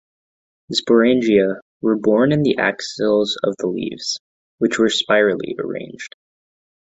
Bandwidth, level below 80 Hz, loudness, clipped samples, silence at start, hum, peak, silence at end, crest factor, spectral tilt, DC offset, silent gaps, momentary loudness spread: 8.2 kHz; -58 dBFS; -18 LUFS; under 0.1%; 0.7 s; none; -2 dBFS; 0.85 s; 16 dB; -5 dB/octave; under 0.1%; 1.62-1.80 s, 4.20-4.58 s; 12 LU